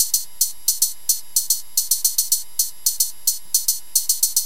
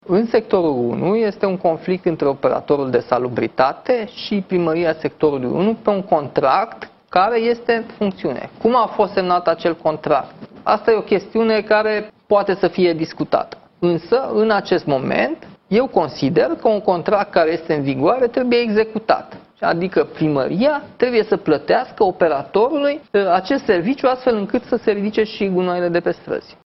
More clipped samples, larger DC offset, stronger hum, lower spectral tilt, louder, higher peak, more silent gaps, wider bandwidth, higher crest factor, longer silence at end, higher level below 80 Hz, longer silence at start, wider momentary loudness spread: neither; first, 3% vs under 0.1%; neither; second, 3.5 dB/octave vs -8 dB/octave; about the same, -19 LUFS vs -18 LUFS; about the same, 0 dBFS vs 0 dBFS; neither; first, 17.5 kHz vs 6 kHz; about the same, 22 dB vs 18 dB; second, 0 s vs 0.15 s; second, -62 dBFS vs -54 dBFS; about the same, 0 s vs 0.05 s; about the same, 3 LU vs 5 LU